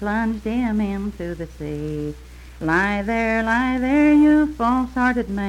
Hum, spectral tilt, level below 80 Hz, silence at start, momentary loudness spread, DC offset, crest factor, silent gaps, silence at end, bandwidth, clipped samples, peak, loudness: none; -7 dB/octave; -38 dBFS; 0 s; 15 LU; under 0.1%; 14 dB; none; 0 s; 10.5 kHz; under 0.1%; -6 dBFS; -20 LUFS